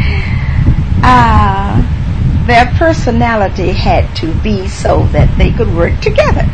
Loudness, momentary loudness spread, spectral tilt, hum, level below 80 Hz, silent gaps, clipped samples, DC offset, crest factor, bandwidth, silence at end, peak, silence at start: -11 LUFS; 7 LU; -7 dB/octave; none; -14 dBFS; none; 0.6%; 4%; 10 dB; 9 kHz; 0 s; 0 dBFS; 0 s